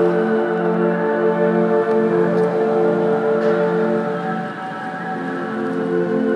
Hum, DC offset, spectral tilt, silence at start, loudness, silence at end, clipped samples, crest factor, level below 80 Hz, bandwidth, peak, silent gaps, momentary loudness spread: none; under 0.1%; -8.5 dB/octave; 0 s; -19 LUFS; 0 s; under 0.1%; 14 dB; -84 dBFS; 8.4 kHz; -4 dBFS; none; 8 LU